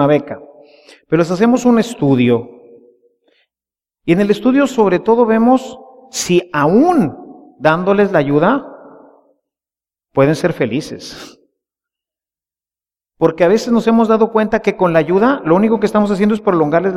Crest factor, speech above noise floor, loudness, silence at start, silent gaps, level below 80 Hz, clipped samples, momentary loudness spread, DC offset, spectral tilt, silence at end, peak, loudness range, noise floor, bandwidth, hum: 14 dB; over 77 dB; -14 LUFS; 0 s; none; -50 dBFS; under 0.1%; 10 LU; under 0.1%; -6.5 dB/octave; 0 s; 0 dBFS; 8 LU; under -90 dBFS; 13.5 kHz; none